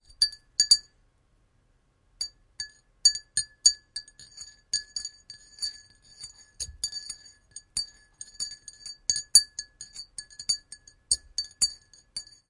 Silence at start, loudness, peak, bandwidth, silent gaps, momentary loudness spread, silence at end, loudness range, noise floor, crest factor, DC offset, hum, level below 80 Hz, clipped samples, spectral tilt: 0.2 s; -26 LUFS; -2 dBFS; 11.5 kHz; none; 25 LU; 0.25 s; 10 LU; -67 dBFS; 30 dB; under 0.1%; none; -60 dBFS; under 0.1%; 3 dB/octave